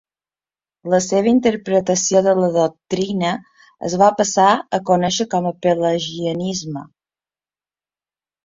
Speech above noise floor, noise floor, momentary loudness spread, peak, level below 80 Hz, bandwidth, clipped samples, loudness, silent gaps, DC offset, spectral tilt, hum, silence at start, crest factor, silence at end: over 73 dB; under -90 dBFS; 10 LU; 0 dBFS; -58 dBFS; 7.8 kHz; under 0.1%; -17 LUFS; none; under 0.1%; -4.5 dB/octave; none; 0.85 s; 18 dB; 1.6 s